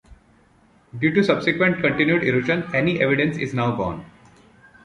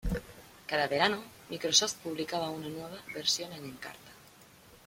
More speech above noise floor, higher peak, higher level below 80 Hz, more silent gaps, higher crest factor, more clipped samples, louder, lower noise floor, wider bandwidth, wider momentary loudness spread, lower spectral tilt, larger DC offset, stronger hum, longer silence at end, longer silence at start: first, 36 dB vs 24 dB; first, -4 dBFS vs -8 dBFS; about the same, -52 dBFS vs -50 dBFS; neither; second, 20 dB vs 26 dB; neither; first, -20 LUFS vs -31 LUFS; about the same, -56 dBFS vs -57 dBFS; second, 10.5 kHz vs 16.5 kHz; second, 8 LU vs 19 LU; first, -7 dB/octave vs -2 dB/octave; neither; neither; first, 0.75 s vs 0.1 s; about the same, 0.1 s vs 0.05 s